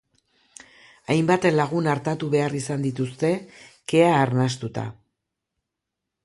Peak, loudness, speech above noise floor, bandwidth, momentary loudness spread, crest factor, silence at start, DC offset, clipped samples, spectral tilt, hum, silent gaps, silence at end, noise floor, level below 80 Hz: -4 dBFS; -23 LUFS; 62 dB; 11.5 kHz; 13 LU; 20 dB; 1.1 s; under 0.1%; under 0.1%; -6 dB/octave; none; none; 1.35 s; -84 dBFS; -62 dBFS